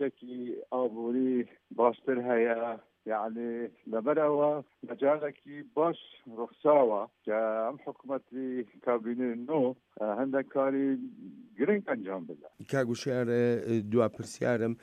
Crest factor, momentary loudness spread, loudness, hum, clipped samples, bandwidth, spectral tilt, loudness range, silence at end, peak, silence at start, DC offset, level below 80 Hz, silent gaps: 20 dB; 13 LU; -31 LUFS; none; under 0.1%; 11 kHz; -7 dB/octave; 2 LU; 0.1 s; -10 dBFS; 0 s; under 0.1%; -80 dBFS; none